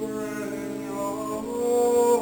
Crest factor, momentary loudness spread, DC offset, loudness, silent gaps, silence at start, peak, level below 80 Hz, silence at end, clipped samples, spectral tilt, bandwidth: 14 dB; 11 LU; under 0.1%; -26 LUFS; none; 0 s; -10 dBFS; -58 dBFS; 0 s; under 0.1%; -4.5 dB/octave; 19 kHz